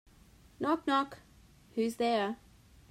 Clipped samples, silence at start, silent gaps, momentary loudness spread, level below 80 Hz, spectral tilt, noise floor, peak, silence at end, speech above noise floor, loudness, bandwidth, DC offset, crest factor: under 0.1%; 0.6 s; none; 13 LU; -64 dBFS; -5 dB/octave; -60 dBFS; -16 dBFS; 0.55 s; 28 dB; -33 LUFS; 16 kHz; under 0.1%; 18 dB